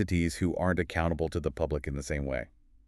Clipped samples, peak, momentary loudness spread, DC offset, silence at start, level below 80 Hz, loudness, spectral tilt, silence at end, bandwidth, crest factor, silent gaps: under 0.1%; -12 dBFS; 6 LU; under 0.1%; 0 s; -42 dBFS; -31 LUFS; -6.5 dB/octave; 0.4 s; 13 kHz; 18 dB; none